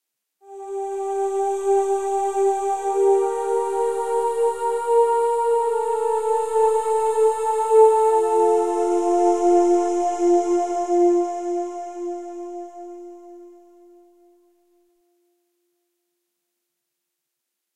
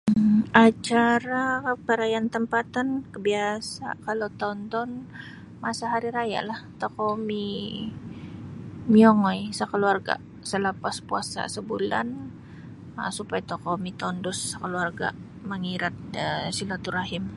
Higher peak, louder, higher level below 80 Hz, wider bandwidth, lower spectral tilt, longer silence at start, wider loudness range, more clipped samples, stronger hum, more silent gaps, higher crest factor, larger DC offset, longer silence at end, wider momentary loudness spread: second, -4 dBFS vs 0 dBFS; first, -20 LUFS vs -26 LUFS; second, -62 dBFS vs -56 dBFS; first, 13.5 kHz vs 11.5 kHz; second, -3.5 dB/octave vs -5 dB/octave; first, 0.45 s vs 0.05 s; first, 12 LU vs 7 LU; neither; neither; neither; second, 18 dB vs 24 dB; neither; first, 4.2 s vs 0 s; second, 13 LU vs 16 LU